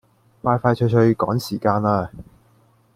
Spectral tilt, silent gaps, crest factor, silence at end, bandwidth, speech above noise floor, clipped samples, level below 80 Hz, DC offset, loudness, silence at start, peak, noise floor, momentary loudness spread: -8 dB/octave; none; 18 dB; 0.75 s; 15.5 kHz; 38 dB; under 0.1%; -52 dBFS; under 0.1%; -20 LUFS; 0.45 s; -2 dBFS; -57 dBFS; 7 LU